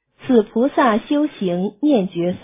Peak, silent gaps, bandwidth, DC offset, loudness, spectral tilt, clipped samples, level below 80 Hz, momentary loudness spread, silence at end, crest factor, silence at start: -2 dBFS; none; 3.8 kHz; under 0.1%; -18 LUFS; -11 dB/octave; under 0.1%; -56 dBFS; 6 LU; 0.05 s; 16 dB; 0.2 s